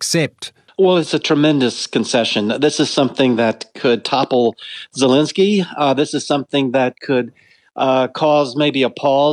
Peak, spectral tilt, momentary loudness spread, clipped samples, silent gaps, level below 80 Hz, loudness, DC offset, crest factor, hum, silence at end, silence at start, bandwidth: -2 dBFS; -4.5 dB/octave; 6 LU; under 0.1%; none; -68 dBFS; -16 LUFS; under 0.1%; 14 dB; none; 0 s; 0 s; 13 kHz